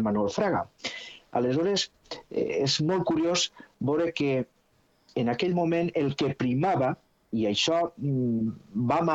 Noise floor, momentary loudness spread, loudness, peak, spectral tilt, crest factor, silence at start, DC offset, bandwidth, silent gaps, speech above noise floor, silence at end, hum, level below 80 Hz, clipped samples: -66 dBFS; 10 LU; -27 LUFS; -12 dBFS; -5 dB/octave; 14 dB; 0 s; under 0.1%; 8.2 kHz; none; 40 dB; 0 s; none; -62 dBFS; under 0.1%